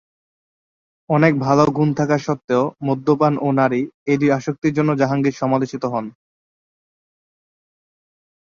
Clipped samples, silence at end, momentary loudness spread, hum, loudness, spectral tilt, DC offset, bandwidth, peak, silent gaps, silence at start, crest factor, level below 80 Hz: under 0.1%; 2.45 s; 7 LU; none; -18 LUFS; -7.5 dB/octave; under 0.1%; 7.2 kHz; 0 dBFS; 2.44-2.48 s, 3.94-4.06 s, 4.58-4.62 s; 1.1 s; 20 dB; -58 dBFS